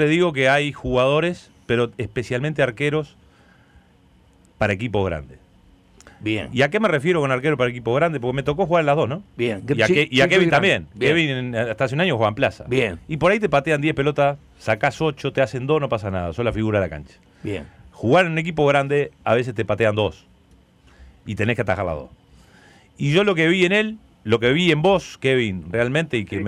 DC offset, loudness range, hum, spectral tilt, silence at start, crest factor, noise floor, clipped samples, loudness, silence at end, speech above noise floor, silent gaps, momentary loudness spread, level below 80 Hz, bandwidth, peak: under 0.1%; 7 LU; none; -6 dB/octave; 0 s; 14 dB; -54 dBFS; under 0.1%; -20 LUFS; 0 s; 34 dB; none; 10 LU; -48 dBFS; 12.5 kHz; -6 dBFS